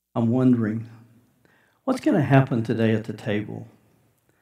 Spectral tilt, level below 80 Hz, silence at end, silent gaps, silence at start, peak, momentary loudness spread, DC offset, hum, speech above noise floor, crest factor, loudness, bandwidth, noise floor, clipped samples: -8.5 dB/octave; -70 dBFS; 0.75 s; none; 0.15 s; -2 dBFS; 15 LU; under 0.1%; none; 42 dB; 22 dB; -23 LUFS; 11 kHz; -63 dBFS; under 0.1%